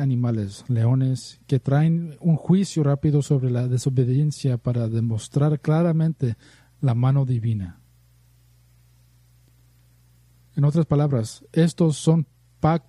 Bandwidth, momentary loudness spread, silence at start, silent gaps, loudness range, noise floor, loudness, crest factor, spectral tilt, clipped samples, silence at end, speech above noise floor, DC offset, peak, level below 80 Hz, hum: 11.5 kHz; 7 LU; 0 s; none; 7 LU; -56 dBFS; -22 LUFS; 16 dB; -8 dB/octave; under 0.1%; 0.1 s; 35 dB; under 0.1%; -6 dBFS; -54 dBFS; 60 Hz at -45 dBFS